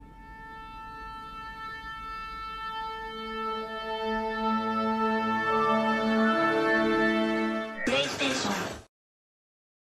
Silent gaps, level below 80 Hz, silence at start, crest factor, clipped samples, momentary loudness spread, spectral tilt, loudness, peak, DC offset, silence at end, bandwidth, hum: none; -54 dBFS; 0 s; 16 dB; under 0.1%; 16 LU; -4 dB/octave; -28 LUFS; -14 dBFS; under 0.1%; 1.15 s; 14 kHz; none